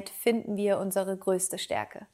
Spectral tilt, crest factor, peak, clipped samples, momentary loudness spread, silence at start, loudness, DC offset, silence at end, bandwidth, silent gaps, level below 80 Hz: -4 dB/octave; 18 dB; -12 dBFS; under 0.1%; 4 LU; 0 s; -29 LUFS; under 0.1%; 0.1 s; 16 kHz; none; -72 dBFS